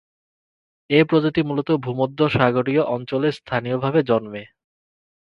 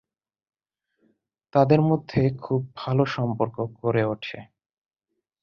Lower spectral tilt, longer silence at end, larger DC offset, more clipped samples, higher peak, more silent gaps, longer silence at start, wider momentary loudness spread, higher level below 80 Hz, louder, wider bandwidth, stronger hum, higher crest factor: about the same, -8.5 dB/octave vs -9 dB/octave; second, 0.85 s vs 1 s; neither; neither; first, 0 dBFS vs -4 dBFS; neither; second, 0.9 s vs 1.55 s; about the same, 7 LU vs 9 LU; about the same, -56 dBFS vs -56 dBFS; first, -20 LUFS vs -24 LUFS; about the same, 6.8 kHz vs 6.8 kHz; neither; about the same, 20 dB vs 22 dB